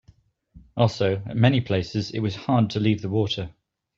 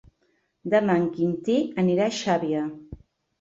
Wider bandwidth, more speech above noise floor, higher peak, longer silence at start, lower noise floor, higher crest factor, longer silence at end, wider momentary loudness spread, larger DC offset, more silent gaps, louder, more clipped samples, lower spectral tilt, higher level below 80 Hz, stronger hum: about the same, 7.4 kHz vs 7.8 kHz; second, 35 dB vs 46 dB; first, -4 dBFS vs -8 dBFS; about the same, 0.55 s vs 0.65 s; second, -58 dBFS vs -70 dBFS; about the same, 20 dB vs 16 dB; about the same, 0.45 s vs 0.45 s; about the same, 8 LU vs 10 LU; neither; neither; about the same, -24 LUFS vs -24 LUFS; neither; about the same, -7 dB/octave vs -6 dB/octave; about the same, -54 dBFS vs -58 dBFS; neither